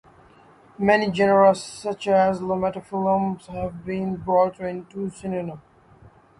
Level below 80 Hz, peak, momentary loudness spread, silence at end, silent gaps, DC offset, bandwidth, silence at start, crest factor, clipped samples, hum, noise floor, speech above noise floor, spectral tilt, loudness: -54 dBFS; -4 dBFS; 13 LU; 0.8 s; none; under 0.1%; 11.5 kHz; 0.8 s; 18 dB; under 0.1%; none; -52 dBFS; 30 dB; -6 dB/octave; -23 LUFS